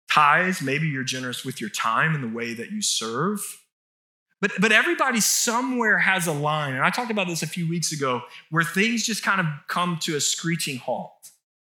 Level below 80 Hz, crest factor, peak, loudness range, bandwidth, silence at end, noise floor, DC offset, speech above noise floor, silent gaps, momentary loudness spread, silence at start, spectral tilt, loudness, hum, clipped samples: -84 dBFS; 22 dB; -2 dBFS; 5 LU; 19 kHz; 0.45 s; under -90 dBFS; under 0.1%; over 66 dB; 3.72-4.26 s; 12 LU; 0.1 s; -3 dB/octave; -23 LUFS; none; under 0.1%